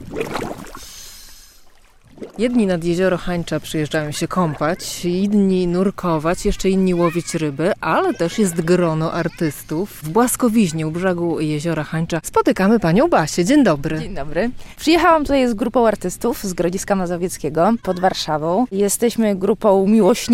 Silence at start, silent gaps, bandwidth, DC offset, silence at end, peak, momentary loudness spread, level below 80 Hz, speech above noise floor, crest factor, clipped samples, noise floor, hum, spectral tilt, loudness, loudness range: 0 s; none; 16.5 kHz; under 0.1%; 0 s; -2 dBFS; 10 LU; -40 dBFS; 29 dB; 16 dB; under 0.1%; -47 dBFS; none; -5.5 dB/octave; -18 LUFS; 4 LU